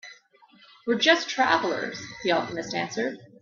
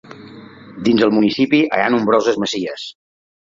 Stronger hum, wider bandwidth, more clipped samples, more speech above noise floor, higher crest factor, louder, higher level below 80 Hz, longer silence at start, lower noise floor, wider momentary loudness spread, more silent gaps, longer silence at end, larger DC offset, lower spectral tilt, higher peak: neither; about the same, 7.4 kHz vs 7.6 kHz; neither; first, 31 dB vs 23 dB; first, 24 dB vs 16 dB; second, -25 LUFS vs -16 LUFS; second, -68 dBFS vs -58 dBFS; about the same, 0.05 s vs 0.1 s; first, -57 dBFS vs -38 dBFS; second, 11 LU vs 14 LU; neither; second, 0.15 s vs 0.55 s; neither; second, -3 dB/octave vs -5 dB/octave; about the same, -4 dBFS vs -2 dBFS